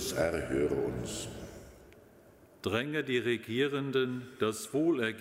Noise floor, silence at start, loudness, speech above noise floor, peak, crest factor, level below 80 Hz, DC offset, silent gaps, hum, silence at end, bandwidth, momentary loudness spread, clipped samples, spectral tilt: -58 dBFS; 0 s; -33 LUFS; 26 dB; -16 dBFS; 18 dB; -56 dBFS; under 0.1%; none; none; 0 s; 16 kHz; 10 LU; under 0.1%; -5 dB/octave